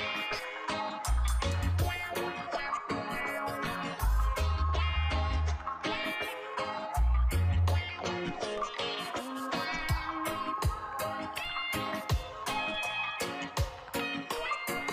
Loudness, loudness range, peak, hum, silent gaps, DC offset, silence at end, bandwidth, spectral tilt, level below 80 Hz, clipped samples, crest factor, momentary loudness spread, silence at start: -33 LUFS; 2 LU; -20 dBFS; none; none; under 0.1%; 0 s; 16 kHz; -4.5 dB/octave; -36 dBFS; under 0.1%; 14 dB; 5 LU; 0 s